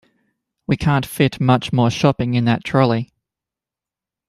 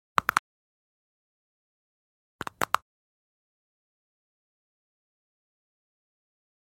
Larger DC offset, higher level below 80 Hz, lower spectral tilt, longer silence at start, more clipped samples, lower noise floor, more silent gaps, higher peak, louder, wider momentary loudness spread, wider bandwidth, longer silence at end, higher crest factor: neither; first, -48 dBFS vs -68 dBFS; first, -7 dB/octave vs -2 dB/octave; first, 0.7 s vs 0.2 s; neither; about the same, -88 dBFS vs under -90 dBFS; second, none vs 0.39-2.39 s; about the same, -2 dBFS vs -2 dBFS; first, -18 LUFS vs -29 LUFS; second, 8 LU vs 15 LU; second, 14 kHz vs 16 kHz; second, 1.25 s vs 3.9 s; second, 18 dB vs 34 dB